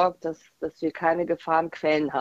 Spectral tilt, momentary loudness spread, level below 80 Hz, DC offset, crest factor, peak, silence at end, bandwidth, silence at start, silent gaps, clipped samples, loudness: -6.5 dB/octave; 11 LU; -64 dBFS; under 0.1%; 18 dB; -8 dBFS; 0 s; 7.8 kHz; 0 s; none; under 0.1%; -26 LUFS